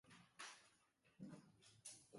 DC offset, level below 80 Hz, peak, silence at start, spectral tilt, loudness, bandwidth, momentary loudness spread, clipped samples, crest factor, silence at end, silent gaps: under 0.1%; under -90 dBFS; -42 dBFS; 0.05 s; -3 dB/octave; -61 LUFS; 11.5 kHz; 9 LU; under 0.1%; 20 dB; 0 s; none